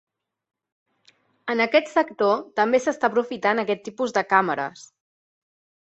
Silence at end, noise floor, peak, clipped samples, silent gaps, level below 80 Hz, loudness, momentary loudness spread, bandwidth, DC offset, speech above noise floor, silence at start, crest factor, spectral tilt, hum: 1.05 s; -61 dBFS; -4 dBFS; under 0.1%; none; -72 dBFS; -22 LUFS; 8 LU; 8.2 kHz; under 0.1%; 39 dB; 1.45 s; 22 dB; -4.5 dB/octave; none